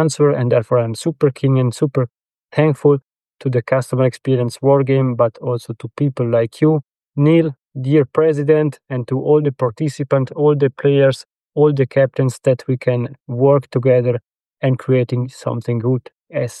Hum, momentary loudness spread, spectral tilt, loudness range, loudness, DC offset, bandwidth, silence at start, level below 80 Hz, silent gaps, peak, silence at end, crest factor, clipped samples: none; 10 LU; -8 dB/octave; 2 LU; -17 LUFS; under 0.1%; 12 kHz; 0 s; -62 dBFS; 2.45-2.49 s; -2 dBFS; 0 s; 14 dB; under 0.1%